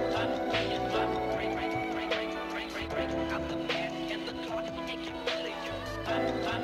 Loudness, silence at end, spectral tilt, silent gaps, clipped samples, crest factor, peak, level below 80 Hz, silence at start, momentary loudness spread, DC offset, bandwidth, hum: -33 LUFS; 0 s; -5 dB/octave; none; under 0.1%; 16 dB; -16 dBFS; -52 dBFS; 0 s; 6 LU; under 0.1%; 16 kHz; none